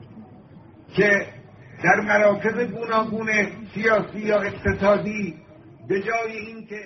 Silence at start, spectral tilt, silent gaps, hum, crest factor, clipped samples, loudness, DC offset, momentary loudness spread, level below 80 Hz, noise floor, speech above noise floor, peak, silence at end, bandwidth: 0 s; -4.5 dB/octave; none; none; 18 dB; under 0.1%; -22 LUFS; under 0.1%; 11 LU; -48 dBFS; -47 dBFS; 25 dB; -4 dBFS; 0 s; 6.2 kHz